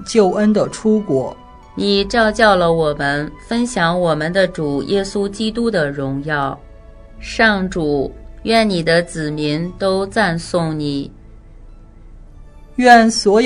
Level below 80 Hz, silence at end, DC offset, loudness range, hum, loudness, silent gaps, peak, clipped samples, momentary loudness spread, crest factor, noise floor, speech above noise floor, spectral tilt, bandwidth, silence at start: -38 dBFS; 0 s; under 0.1%; 4 LU; none; -16 LUFS; none; 0 dBFS; under 0.1%; 11 LU; 16 dB; -38 dBFS; 23 dB; -5 dB/octave; 11 kHz; 0 s